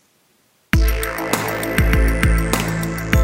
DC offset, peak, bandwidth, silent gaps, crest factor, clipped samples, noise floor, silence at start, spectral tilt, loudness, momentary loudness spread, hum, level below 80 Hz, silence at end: under 0.1%; 0 dBFS; 16.5 kHz; none; 18 dB; under 0.1%; -59 dBFS; 0.75 s; -5 dB/octave; -19 LUFS; 5 LU; none; -22 dBFS; 0 s